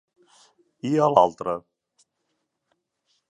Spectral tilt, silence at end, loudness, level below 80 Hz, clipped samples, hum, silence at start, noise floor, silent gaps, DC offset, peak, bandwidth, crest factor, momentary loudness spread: -7 dB/octave; 1.7 s; -22 LUFS; -68 dBFS; under 0.1%; none; 0.85 s; -77 dBFS; none; under 0.1%; -2 dBFS; 10.5 kHz; 26 dB; 15 LU